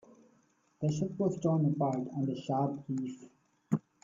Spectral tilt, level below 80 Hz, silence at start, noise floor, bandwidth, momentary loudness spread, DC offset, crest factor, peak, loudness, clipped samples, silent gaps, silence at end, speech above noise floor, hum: -8.5 dB/octave; -72 dBFS; 0.8 s; -70 dBFS; 7.6 kHz; 8 LU; under 0.1%; 18 dB; -16 dBFS; -34 LUFS; under 0.1%; none; 0.25 s; 38 dB; none